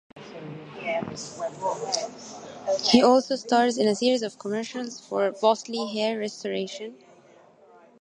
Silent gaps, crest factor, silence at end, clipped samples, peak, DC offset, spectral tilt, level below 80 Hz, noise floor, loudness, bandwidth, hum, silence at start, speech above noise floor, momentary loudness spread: none; 24 dB; 1.05 s; under 0.1%; -2 dBFS; under 0.1%; -3.5 dB/octave; -70 dBFS; -54 dBFS; -25 LUFS; 10.5 kHz; none; 0.15 s; 29 dB; 20 LU